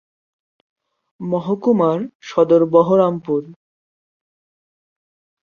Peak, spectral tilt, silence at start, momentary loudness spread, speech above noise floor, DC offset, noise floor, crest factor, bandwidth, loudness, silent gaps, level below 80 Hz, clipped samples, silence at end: -2 dBFS; -8.5 dB/octave; 1.2 s; 11 LU; over 74 dB; under 0.1%; under -90 dBFS; 18 dB; 6.8 kHz; -17 LUFS; 2.15-2.20 s; -64 dBFS; under 0.1%; 1.9 s